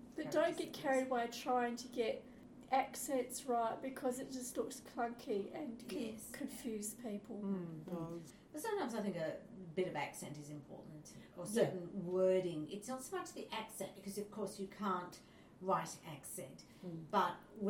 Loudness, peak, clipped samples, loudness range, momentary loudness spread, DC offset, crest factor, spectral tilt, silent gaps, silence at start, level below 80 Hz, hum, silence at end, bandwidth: -41 LUFS; -22 dBFS; under 0.1%; 5 LU; 14 LU; under 0.1%; 20 dB; -4.5 dB/octave; none; 0 s; -74 dBFS; none; 0 s; 17 kHz